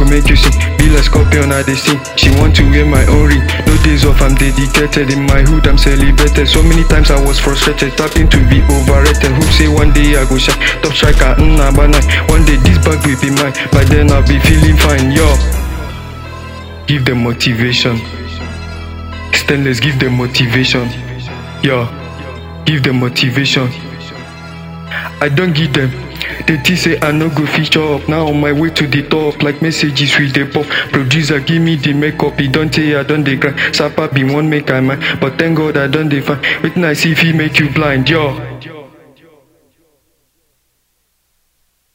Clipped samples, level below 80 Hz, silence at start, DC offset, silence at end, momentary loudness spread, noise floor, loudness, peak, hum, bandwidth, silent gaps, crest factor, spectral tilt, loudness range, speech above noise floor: 0.8%; -14 dBFS; 0 s; under 0.1%; 3.1 s; 14 LU; -61 dBFS; -11 LUFS; 0 dBFS; none; 16.5 kHz; none; 10 dB; -5 dB/octave; 5 LU; 52 dB